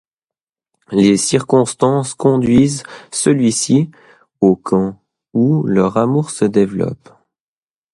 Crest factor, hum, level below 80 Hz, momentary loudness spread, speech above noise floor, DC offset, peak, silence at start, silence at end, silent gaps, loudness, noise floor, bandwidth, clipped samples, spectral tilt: 16 dB; none; -50 dBFS; 10 LU; over 76 dB; under 0.1%; 0 dBFS; 0.9 s; 1 s; none; -15 LUFS; under -90 dBFS; 11.5 kHz; under 0.1%; -6 dB/octave